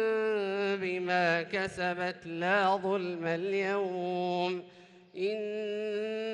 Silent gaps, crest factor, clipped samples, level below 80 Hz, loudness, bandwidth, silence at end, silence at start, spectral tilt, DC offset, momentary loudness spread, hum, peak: none; 16 dB; under 0.1%; -72 dBFS; -31 LUFS; 10.5 kHz; 0 s; 0 s; -5.5 dB/octave; under 0.1%; 7 LU; none; -16 dBFS